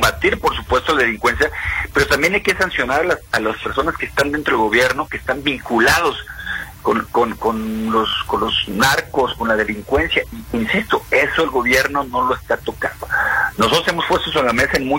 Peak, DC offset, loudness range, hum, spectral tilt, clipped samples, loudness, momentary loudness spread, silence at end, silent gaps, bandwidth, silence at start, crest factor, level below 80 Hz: 0 dBFS; under 0.1%; 1 LU; none; -3.5 dB/octave; under 0.1%; -17 LUFS; 6 LU; 0 s; none; 16.5 kHz; 0 s; 18 dB; -36 dBFS